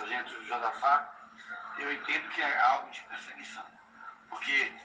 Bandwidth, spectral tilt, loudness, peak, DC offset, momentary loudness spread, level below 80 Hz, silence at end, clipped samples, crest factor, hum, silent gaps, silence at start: 9.6 kHz; -1.5 dB/octave; -30 LUFS; -12 dBFS; under 0.1%; 21 LU; -80 dBFS; 0 s; under 0.1%; 20 dB; none; none; 0 s